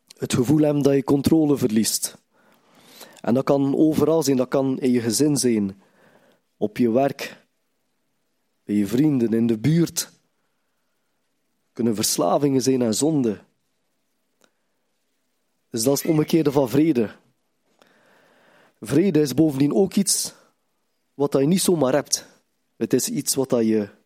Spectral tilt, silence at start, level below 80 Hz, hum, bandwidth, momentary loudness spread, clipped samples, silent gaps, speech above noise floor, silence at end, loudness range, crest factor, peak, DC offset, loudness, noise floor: -5 dB/octave; 0.2 s; -60 dBFS; none; 16.5 kHz; 8 LU; under 0.1%; none; 54 dB; 0.2 s; 4 LU; 18 dB; -4 dBFS; under 0.1%; -21 LUFS; -74 dBFS